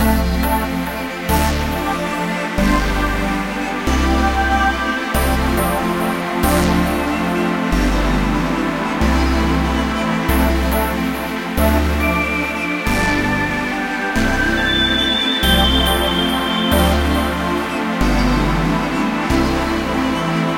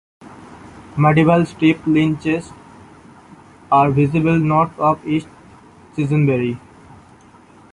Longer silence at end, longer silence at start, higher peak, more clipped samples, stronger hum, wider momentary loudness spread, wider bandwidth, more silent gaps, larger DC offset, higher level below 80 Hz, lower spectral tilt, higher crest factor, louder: second, 0 s vs 1.15 s; second, 0 s vs 0.25 s; about the same, -2 dBFS vs -2 dBFS; neither; neither; second, 5 LU vs 11 LU; first, 17 kHz vs 10.5 kHz; neither; neither; first, -24 dBFS vs -50 dBFS; second, -5 dB/octave vs -8 dB/octave; about the same, 14 dB vs 16 dB; about the same, -17 LUFS vs -17 LUFS